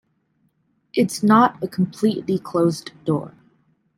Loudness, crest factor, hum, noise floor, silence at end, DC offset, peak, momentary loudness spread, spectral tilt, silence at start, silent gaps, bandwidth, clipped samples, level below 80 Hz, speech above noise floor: -20 LUFS; 18 dB; none; -66 dBFS; 0.7 s; under 0.1%; -4 dBFS; 11 LU; -6.5 dB/octave; 0.95 s; none; 16 kHz; under 0.1%; -64 dBFS; 47 dB